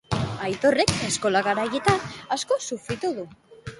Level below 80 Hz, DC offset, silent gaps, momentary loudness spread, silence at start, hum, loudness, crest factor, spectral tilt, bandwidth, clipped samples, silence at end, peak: -48 dBFS; under 0.1%; none; 9 LU; 0.1 s; none; -24 LUFS; 24 dB; -4 dB/octave; 11.5 kHz; under 0.1%; 0 s; 0 dBFS